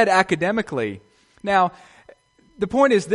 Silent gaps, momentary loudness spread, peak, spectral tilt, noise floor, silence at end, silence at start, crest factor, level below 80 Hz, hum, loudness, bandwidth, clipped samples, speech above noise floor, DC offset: none; 12 LU; 0 dBFS; -5 dB/octave; -52 dBFS; 0 s; 0 s; 20 dB; -56 dBFS; none; -21 LUFS; 11.5 kHz; under 0.1%; 32 dB; under 0.1%